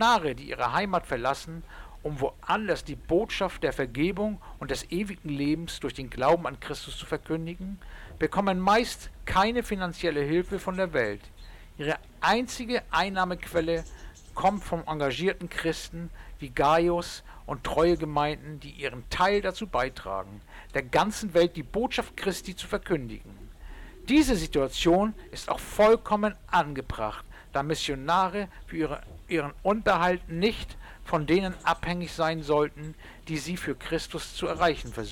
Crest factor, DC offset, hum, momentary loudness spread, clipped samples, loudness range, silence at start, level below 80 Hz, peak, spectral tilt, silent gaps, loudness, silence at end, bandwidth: 16 dB; under 0.1%; none; 15 LU; under 0.1%; 3 LU; 0 s; -44 dBFS; -12 dBFS; -5 dB/octave; none; -28 LUFS; 0 s; 18 kHz